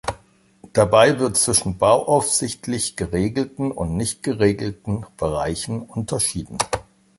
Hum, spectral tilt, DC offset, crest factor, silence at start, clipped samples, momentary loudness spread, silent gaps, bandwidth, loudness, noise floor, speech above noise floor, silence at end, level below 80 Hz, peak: none; -4 dB/octave; under 0.1%; 20 dB; 0.05 s; under 0.1%; 11 LU; none; 12 kHz; -20 LUFS; -53 dBFS; 32 dB; 0.35 s; -42 dBFS; 0 dBFS